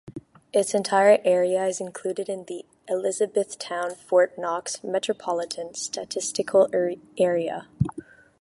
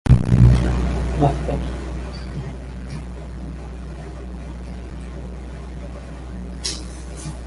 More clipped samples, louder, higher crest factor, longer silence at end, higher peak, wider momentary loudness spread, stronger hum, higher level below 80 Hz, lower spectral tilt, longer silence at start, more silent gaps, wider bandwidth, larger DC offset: neither; about the same, -25 LUFS vs -23 LUFS; about the same, 20 dB vs 20 dB; first, 0.4 s vs 0 s; second, -6 dBFS vs 0 dBFS; second, 12 LU vs 19 LU; neither; second, -56 dBFS vs -26 dBFS; second, -4 dB/octave vs -7 dB/octave; about the same, 0.05 s vs 0.05 s; neither; about the same, 11.5 kHz vs 11.5 kHz; neither